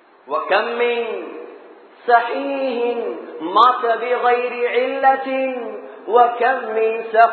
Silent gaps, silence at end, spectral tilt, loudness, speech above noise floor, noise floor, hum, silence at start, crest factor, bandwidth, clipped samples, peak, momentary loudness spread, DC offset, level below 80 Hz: none; 0 s; -5 dB/octave; -18 LUFS; 25 dB; -43 dBFS; none; 0.25 s; 18 dB; 4.5 kHz; under 0.1%; 0 dBFS; 14 LU; under 0.1%; -86 dBFS